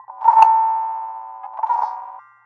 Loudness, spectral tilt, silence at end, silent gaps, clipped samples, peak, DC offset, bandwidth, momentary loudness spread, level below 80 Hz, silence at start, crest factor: -17 LUFS; 0 dB/octave; 0.25 s; none; under 0.1%; 0 dBFS; under 0.1%; 6.8 kHz; 20 LU; -84 dBFS; 0.1 s; 18 dB